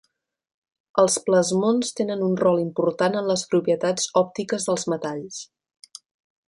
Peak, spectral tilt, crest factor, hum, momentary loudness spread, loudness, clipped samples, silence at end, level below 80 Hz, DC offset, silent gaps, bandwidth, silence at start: -4 dBFS; -4.5 dB/octave; 18 dB; none; 8 LU; -22 LUFS; under 0.1%; 1.05 s; -68 dBFS; under 0.1%; none; 11.5 kHz; 0.95 s